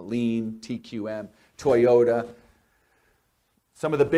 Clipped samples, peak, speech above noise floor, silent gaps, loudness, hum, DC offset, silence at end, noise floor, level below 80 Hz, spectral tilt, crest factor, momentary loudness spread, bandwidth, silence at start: under 0.1%; -8 dBFS; 47 dB; none; -24 LUFS; none; under 0.1%; 0 s; -70 dBFS; -62 dBFS; -7 dB/octave; 18 dB; 17 LU; 12 kHz; 0 s